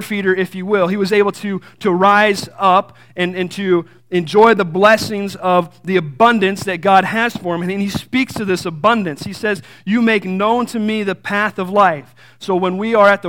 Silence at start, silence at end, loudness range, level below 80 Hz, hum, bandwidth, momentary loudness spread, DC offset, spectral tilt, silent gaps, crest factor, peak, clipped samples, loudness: 0 s; 0 s; 3 LU; -56 dBFS; none; 17 kHz; 9 LU; 0.3%; -5.5 dB/octave; none; 16 dB; 0 dBFS; under 0.1%; -16 LUFS